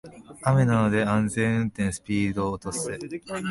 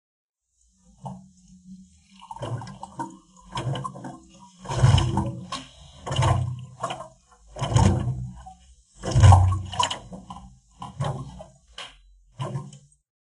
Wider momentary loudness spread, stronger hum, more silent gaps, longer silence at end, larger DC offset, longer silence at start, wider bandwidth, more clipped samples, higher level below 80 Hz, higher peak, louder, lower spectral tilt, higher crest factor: second, 11 LU vs 24 LU; neither; neither; second, 0 s vs 0.45 s; neither; second, 0.05 s vs 1.05 s; about the same, 11.5 kHz vs 11.5 kHz; neither; second, -50 dBFS vs -38 dBFS; second, -8 dBFS vs -2 dBFS; about the same, -25 LUFS vs -24 LUFS; about the same, -6 dB/octave vs -5.5 dB/octave; second, 18 dB vs 24 dB